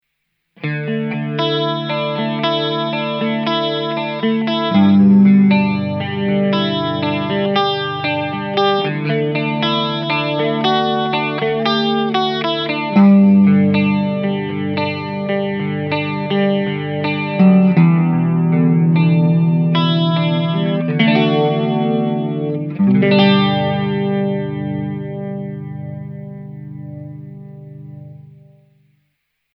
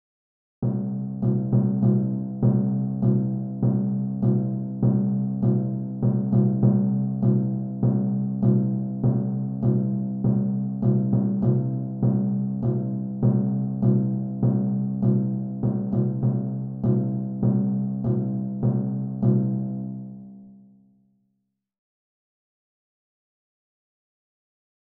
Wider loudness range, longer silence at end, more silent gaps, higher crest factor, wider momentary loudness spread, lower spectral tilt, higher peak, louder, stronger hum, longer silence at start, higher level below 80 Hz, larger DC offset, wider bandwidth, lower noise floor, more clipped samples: first, 9 LU vs 4 LU; second, 1.25 s vs 4.3 s; neither; about the same, 16 dB vs 16 dB; first, 15 LU vs 6 LU; second, -8.5 dB/octave vs -15 dB/octave; first, 0 dBFS vs -8 dBFS; first, -16 LUFS vs -24 LUFS; first, 50 Hz at -40 dBFS vs none; about the same, 0.6 s vs 0.6 s; second, -66 dBFS vs -52 dBFS; neither; first, 6 kHz vs 1.7 kHz; second, -71 dBFS vs -76 dBFS; neither